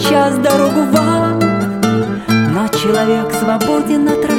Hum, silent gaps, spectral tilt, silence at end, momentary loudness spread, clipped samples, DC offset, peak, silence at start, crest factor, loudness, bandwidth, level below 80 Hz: none; none; -5.5 dB/octave; 0 s; 3 LU; under 0.1%; under 0.1%; 0 dBFS; 0 s; 12 dB; -13 LUFS; 17 kHz; -46 dBFS